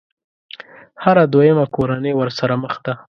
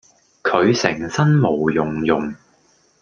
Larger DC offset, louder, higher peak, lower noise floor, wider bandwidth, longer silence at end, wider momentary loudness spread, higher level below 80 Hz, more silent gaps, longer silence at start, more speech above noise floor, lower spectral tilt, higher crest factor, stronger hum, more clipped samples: neither; about the same, -16 LUFS vs -18 LUFS; about the same, 0 dBFS vs 0 dBFS; second, -39 dBFS vs -58 dBFS; about the same, 6.6 kHz vs 7.2 kHz; second, 0.2 s vs 0.65 s; first, 20 LU vs 6 LU; about the same, -54 dBFS vs -52 dBFS; neither; first, 1 s vs 0.45 s; second, 23 dB vs 40 dB; first, -8 dB/octave vs -6 dB/octave; about the same, 16 dB vs 18 dB; neither; neither